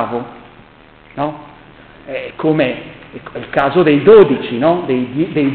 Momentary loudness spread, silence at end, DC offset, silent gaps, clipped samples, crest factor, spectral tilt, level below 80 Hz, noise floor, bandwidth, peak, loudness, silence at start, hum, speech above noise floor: 25 LU; 0 s; under 0.1%; none; under 0.1%; 14 dB; -9.5 dB/octave; -48 dBFS; -43 dBFS; 4.5 kHz; 0 dBFS; -13 LUFS; 0 s; none; 29 dB